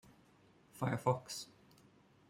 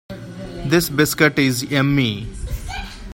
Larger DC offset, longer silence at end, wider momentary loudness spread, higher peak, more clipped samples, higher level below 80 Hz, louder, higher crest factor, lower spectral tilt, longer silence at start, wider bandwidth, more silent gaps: neither; first, 0.85 s vs 0 s; about the same, 18 LU vs 16 LU; second, -18 dBFS vs 0 dBFS; neither; second, -76 dBFS vs -36 dBFS; second, -39 LUFS vs -18 LUFS; about the same, 24 dB vs 20 dB; about the same, -5.5 dB/octave vs -5 dB/octave; first, 0.75 s vs 0.1 s; about the same, 16 kHz vs 16.5 kHz; neither